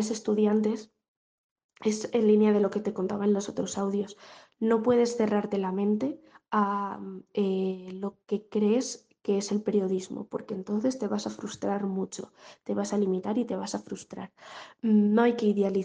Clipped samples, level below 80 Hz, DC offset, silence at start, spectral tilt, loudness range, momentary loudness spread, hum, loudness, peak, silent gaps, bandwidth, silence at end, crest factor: under 0.1%; -74 dBFS; under 0.1%; 0 s; -6 dB/octave; 5 LU; 14 LU; none; -28 LUFS; -10 dBFS; 1.08-1.56 s, 1.64-1.69 s; 9.6 kHz; 0 s; 18 dB